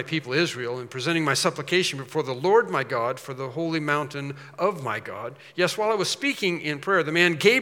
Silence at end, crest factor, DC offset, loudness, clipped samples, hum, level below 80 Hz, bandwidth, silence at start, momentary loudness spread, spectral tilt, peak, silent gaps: 0 s; 22 dB; under 0.1%; -24 LUFS; under 0.1%; none; -78 dBFS; 17.5 kHz; 0 s; 12 LU; -4 dB/octave; -4 dBFS; none